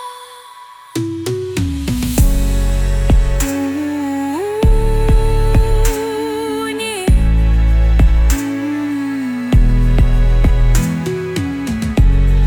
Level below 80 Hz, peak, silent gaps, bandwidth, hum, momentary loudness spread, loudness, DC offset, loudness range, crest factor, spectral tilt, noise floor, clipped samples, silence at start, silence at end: -14 dBFS; -2 dBFS; none; 18.5 kHz; none; 7 LU; -16 LUFS; under 0.1%; 2 LU; 12 dB; -6 dB/octave; -37 dBFS; under 0.1%; 0 s; 0 s